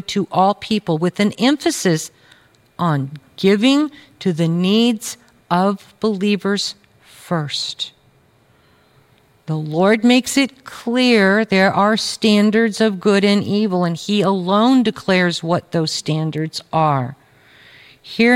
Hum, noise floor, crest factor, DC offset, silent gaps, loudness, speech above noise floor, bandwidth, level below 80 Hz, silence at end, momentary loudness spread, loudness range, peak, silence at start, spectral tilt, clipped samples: none; -55 dBFS; 16 dB; under 0.1%; none; -17 LUFS; 38 dB; 16 kHz; -60 dBFS; 0 s; 11 LU; 6 LU; -2 dBFS; 0.1 s; -5 dB/octave; under 0.1%